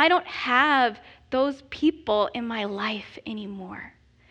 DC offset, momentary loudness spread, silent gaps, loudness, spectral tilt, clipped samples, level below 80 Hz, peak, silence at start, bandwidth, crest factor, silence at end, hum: under 0.1%; 17 LU; none; -25 LUFS; -5 dB/octave; under 0.1%; -58 dBFS; -6 dBFS; 0 s; 8.4 kHz; 20 dB; 0.4 s; none